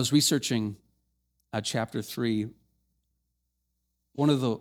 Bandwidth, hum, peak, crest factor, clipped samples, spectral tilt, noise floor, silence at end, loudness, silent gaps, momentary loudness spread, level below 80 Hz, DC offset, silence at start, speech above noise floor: 19 kHz; 60 Hz at -60 dBFS; -10 dBFS; 20 dB; under 0.1%; -4.5 dB/octave; -79 dBFS; 0 s; -28 LUFS; none; 14 LU; -68 dBFS; under 0.1%; 0 s; 52 dB